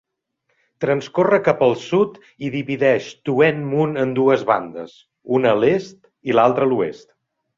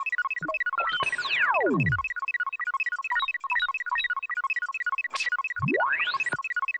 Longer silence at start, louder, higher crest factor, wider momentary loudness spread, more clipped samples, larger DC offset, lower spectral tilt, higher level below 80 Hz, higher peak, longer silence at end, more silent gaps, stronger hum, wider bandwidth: first, 0.8 s vs 0 s; first, -19 LUFS vs -26 LUFS; about the same, 18 dB vs 14 dB; first, 11 LU vs 5 LU; neither; neither; first, -7 dB/octave vs -4.5 dB/octave; about the same, -62 dBFS vs -60 dBFS; first, -2 dBFS vs -14 dBFS; first, 0.6 s vs 0 s; neither; neither; second, 7.4 kHz vs 11 kHz